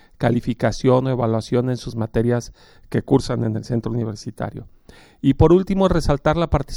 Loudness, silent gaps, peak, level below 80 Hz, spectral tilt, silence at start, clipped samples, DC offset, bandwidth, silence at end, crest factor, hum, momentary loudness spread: -20 LUFS; none; -2 dBFS; -34 dBFS; -7.5 dB/octave; 0.2 s; under 0.1%; under 0.1%; 12 kHz; 0 s; 18 dB; none; 13 LU